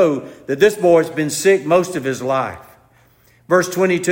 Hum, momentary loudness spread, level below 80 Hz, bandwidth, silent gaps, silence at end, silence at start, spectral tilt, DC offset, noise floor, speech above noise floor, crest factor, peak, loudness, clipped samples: none; 8 LU; -58 dBFS; 16.5 kHz; none; 0 s; 0 s; -5 dB/octave; under 0.1%; -53 dBFS; 37 dB; 16 dB; -2 dBFS; -17 LUFS; under 0.1%